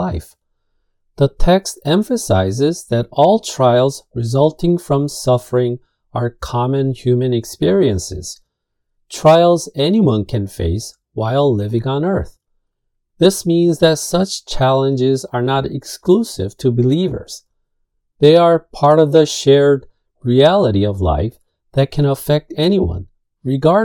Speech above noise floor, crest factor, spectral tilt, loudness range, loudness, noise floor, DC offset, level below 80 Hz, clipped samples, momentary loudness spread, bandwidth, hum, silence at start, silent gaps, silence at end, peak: 58 dB; 16 dB; -6 dB/octave; 4 LU; -15 LUFS; -72 dBFS; under 0.1%; -34 dBFS; under 0.1%; 12 LU; 18 kHz; none; 0 s; none; 0 s; 0 dBFS